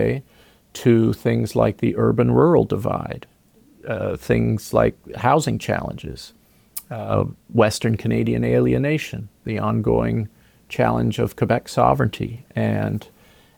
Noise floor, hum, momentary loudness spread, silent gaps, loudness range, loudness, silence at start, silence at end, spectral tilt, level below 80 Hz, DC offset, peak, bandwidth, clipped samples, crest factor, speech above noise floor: -54 dBFS; none; 14 LU; none; 3 LU; -21 LUFS; 0 s; 0.55 s; -7 dB/octave; -42 dBFS; under 0.1%; -2 dBFS; 18.5 kHz; under 0.1%; 18 dB; 34 dB